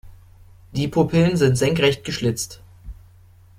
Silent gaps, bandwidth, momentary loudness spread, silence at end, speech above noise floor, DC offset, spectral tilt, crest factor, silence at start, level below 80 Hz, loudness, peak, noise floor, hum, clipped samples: none; 16 kHz; 13 LU; 0.65 s; 30 dB; under 0.1%; -5.5 dB/octave; 18 dB; 0.05 s; -44 dBFS; -20 LUFS; -4 dBFS; -49 dBFS; none; under 0.1%